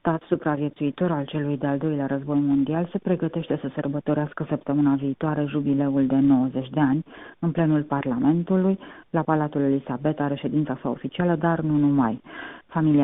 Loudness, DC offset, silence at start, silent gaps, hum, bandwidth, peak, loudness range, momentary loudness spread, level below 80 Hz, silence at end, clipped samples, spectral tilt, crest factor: -24 LUFS; under 0.1%; 0.05 s; none; none; 3.9 kHz; -8 dBFS; 2 LU; 7 LU; -56 dBFS; 0 s; under 0.1%; -8 dB/octave; 16 dB